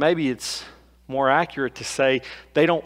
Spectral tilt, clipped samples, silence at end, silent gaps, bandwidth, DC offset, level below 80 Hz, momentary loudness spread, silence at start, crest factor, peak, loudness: -4.5 dB/octave; under 0.1%; 0 s; none; 16 kHz; under 0.1%; -56 dBFS; 10 LU; 0 s; 18 dB; -4 dBFS; -23 LUFS